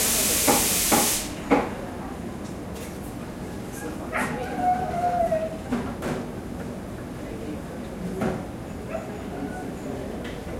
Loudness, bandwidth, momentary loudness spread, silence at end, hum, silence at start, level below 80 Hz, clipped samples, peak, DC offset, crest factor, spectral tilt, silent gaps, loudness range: -27 LUFS; 16.5 kHz; 16 LU; 0 s; none; 0 s; -44 dBFS; under 0.1%; -4 dBFS; under 0.1%; 22 dB; -3 dB/octave; none; 9 LU